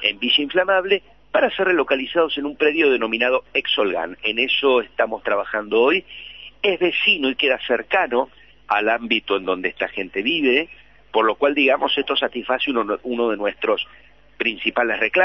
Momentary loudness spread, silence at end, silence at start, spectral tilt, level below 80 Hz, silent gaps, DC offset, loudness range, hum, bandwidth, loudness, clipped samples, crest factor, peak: 7 LU; 0 s; 0 s; -6 dB/octave; -56 dBFS; none; 0.2%; 2 LU; none; 6 kHz; -20 LUFS; under 0.1%; 18 dB; -2 dBFS